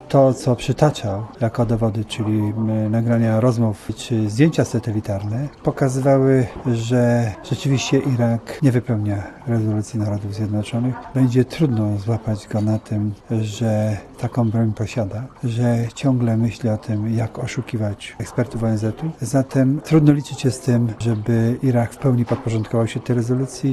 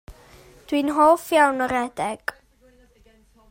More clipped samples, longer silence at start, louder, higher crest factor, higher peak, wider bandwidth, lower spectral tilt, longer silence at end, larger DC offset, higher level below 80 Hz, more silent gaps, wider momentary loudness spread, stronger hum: neither; about the same, 0 s vs 0.1 s; about the same, -20 LUFS vs -21 LUFS; about the same, 18 dB vs 20 dB; first, 0 dBFS vs -4 dBFS; second, 12.5 kHz vs 16 kHz; first, -7.5 dB/octave vs -4 dB/octave; second, 0 s vs 1.2 s; neither; first, -46 dBFS vs -54 dBFS; neither; second, 8 LU vs 12 LU; neither